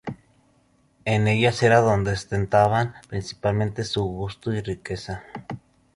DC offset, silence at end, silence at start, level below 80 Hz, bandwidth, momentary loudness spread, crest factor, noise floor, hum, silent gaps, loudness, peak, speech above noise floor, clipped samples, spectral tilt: under 0.1%; 0.4 s; 0.05 s; -46 dBFS; 11 kHz; 19 LU; 20 dB; -62 dBFS; none; none; -23 LUFS; -4 dBFS; 40 dB; under 0.1%; -6 dB/octave